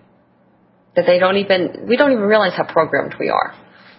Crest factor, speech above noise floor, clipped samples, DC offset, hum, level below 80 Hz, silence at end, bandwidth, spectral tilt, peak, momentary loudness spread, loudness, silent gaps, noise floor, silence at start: 18 dB; 39 dB; under 0.1%; under 0.1%; none; -62 dBFS; 0.45 s; 5.8 kHz; -8.5 dB/octave; 0 dBFS; 6 LU; -16 LUFS; none; -54 dBFS; 0.95 s